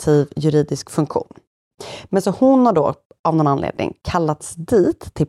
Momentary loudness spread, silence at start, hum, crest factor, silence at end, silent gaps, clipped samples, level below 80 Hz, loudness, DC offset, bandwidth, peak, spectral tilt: 12 LU; 0 s; none; 14 dB; 0 s; 1.47-1.71 s, 3.05-3.10 s, 3.19-3.24 s; under 0.1%; -46 dBFS; -18 LUFS; under 0.1%; 13 kHz; -4 dBFS; -7 dB/octave